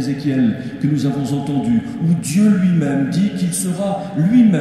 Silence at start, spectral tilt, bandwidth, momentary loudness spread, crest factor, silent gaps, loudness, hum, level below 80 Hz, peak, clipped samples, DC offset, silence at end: 0 s; -6.5 dB/octave; 14 kHz; 6 LU; 12 dB; none; -17 LUFS; none; -50 dBFS; -4 dBFS; under 0.1%; under 0.1%; 0 s